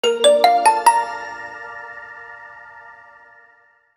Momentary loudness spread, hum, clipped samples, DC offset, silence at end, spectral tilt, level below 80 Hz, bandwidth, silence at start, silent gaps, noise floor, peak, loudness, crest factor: 25 LU; none; under 0.1%; under 0.1%; 1.05 s; 0 dB/octave; -68 dBFS; 19.5 kHz; 0.05 s; none; -55 dBFS; -2 dBFS; -15 LUFS; 18 dB